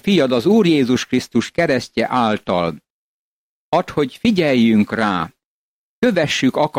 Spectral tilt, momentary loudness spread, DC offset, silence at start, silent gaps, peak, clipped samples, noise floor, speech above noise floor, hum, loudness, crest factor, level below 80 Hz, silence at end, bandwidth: -5.5 dB/octave; 7 LU; under 0.1%; 0.05 s; 2.90-3.72 s, 5.45-6.02 s; -4 dBFS; under 0.1%; -88 dBFS; 71 dB; none; -17 LUFS; 14 dB; -52 dBFS; 0 s; 15.5 kHz